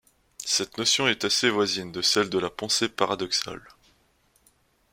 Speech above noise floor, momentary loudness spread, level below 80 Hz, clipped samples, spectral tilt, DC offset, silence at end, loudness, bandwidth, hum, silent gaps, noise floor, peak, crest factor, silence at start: 39 dB; 6 LU; -62 dBFS; under 0.1%; -2 dB/octave; under 0.1%; 1.35 s; -24 LUFS; 16.5 kHz; none; none; -65 dBFS; -6 dBFS; 22 dB; 0.4 s